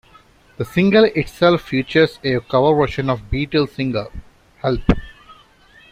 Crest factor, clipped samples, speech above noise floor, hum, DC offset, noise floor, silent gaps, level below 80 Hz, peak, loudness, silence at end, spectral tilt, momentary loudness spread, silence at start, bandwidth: 18 dB; under 0.1%; 33 dB; none; under 0.1%; -50 dBFS; none; -34 dBFS; -2 dBFS; -18 LUFS; 0.6 s; -7.5 dB/octave; 9 LU; 0.6 s; 15.5 kHz